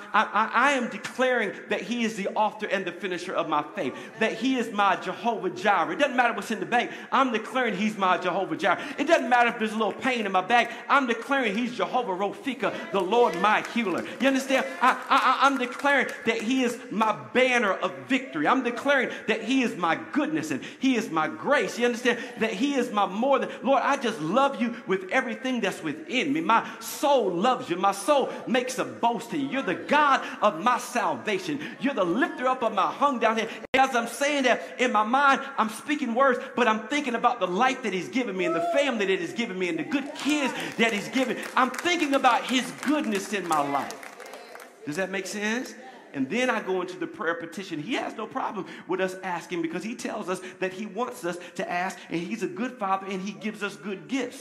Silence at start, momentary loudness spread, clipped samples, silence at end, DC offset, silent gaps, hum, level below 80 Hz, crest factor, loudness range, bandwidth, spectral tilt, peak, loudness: 0 s; 10 LU; under 0.1%; 0 s; under 0.1%; 33.68-33.73 s; none; -76 dBFS; 20 dB; 7 LU; 15 kHz; -4 dB/octave; -6 dBFS; -26 LUFS